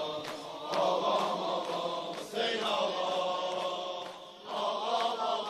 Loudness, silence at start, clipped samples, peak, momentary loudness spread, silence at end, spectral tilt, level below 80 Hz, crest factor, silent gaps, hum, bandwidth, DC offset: -33 LUFS; 0 s; under 0.1%; -16 dBFS; 10 LU; 0 s; -3 dB/octave; -80 dBFS; 18 dB; none; none; 13.5 kHz; under 0.1%